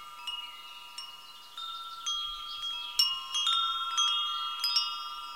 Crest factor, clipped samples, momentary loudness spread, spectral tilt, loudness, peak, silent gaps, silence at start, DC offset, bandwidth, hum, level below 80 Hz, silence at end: 22 dB; under 0.1%; 16 LU; 3.5 dB/octave; -30 LUFS; -12 dBFS; none; 0 s; 0.1%; 16.5 kHz; none; -68 dBFS; 0 s